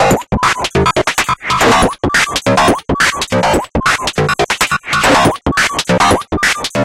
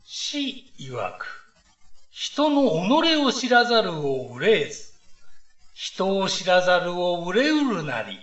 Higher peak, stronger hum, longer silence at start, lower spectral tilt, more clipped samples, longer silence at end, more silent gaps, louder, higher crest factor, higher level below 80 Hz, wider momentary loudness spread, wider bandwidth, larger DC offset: first, 0 dBFS vs -4 dBFS; neither; about the same, 0 s vs 0.05 s; about the same, -3.5 dB/octave vs -4 dB/octave; neither; about the same, 0 s vs 0.05 s; neither; first, -12 LUFS vs -22 LUFS; second, 12 dB vs 18 dB; first, -30 dBFS vs -62 dBFS; second, 4 LU vs 14 LU; first, 17 kHz vs 8.2 kHz; second, under 0.1% vs 0.5%